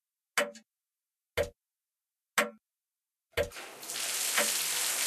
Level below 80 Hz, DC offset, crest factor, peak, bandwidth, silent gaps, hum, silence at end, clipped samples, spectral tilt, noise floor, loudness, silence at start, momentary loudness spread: -60 dBFS; under 0.1%; 24 dB; -12 dBFS; 14 kHz; none; none; 0 s; under 0.1%; -0.5 dB/octave; under -90 dBFS; -32 LUFS; 0.35 s; 11 LU